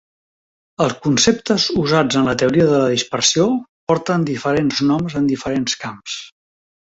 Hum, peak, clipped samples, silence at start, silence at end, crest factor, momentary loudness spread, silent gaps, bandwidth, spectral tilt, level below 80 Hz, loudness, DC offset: none; -2 dBFS; under 0.1%; 0.8 s; 0.65 s; 16 dB; 8 LU; 3.69-3.87 s; 8 kHz; -4 dB/octave; -50 dBFS; -17 LUFS; under 0.1%